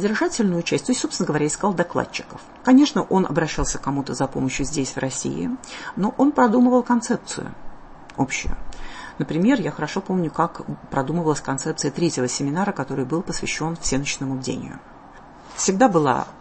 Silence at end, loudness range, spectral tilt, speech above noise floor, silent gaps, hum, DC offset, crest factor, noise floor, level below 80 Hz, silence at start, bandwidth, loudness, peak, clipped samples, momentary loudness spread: 0 s; 4 LU; -5 dB/octave; 22 dB; none; none; under 0.1%; 18 dB; -44 dBFS; -40 dBFS; 0 s; 8.8 kHz; -22 LUFS; -4 dBFS; under 0.1%; 15 LU